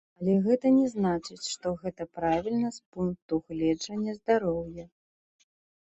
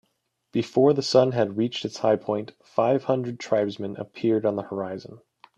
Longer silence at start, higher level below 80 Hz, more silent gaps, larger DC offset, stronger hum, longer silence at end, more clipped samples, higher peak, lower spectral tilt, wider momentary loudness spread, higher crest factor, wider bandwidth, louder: second, 0.2 s vs 0.55 s; first, -58 dBFS vs -68 dBFS; first, 2.86-2.92 s, 3.22-3.29 s vs none; neither; neither; first, 1.05 s vs 0.4 s; neither; second, -12 dBFS vs -4 dBFS; about the same, -6 dB/octave vs -6 dB/octave; about the same, 11 LU vs 11 LU; about the same, 18 dB vs 20 dB; second, 8.2 kHz vs 10.5 kHz; second, -29 LUFS vs -25 LUFS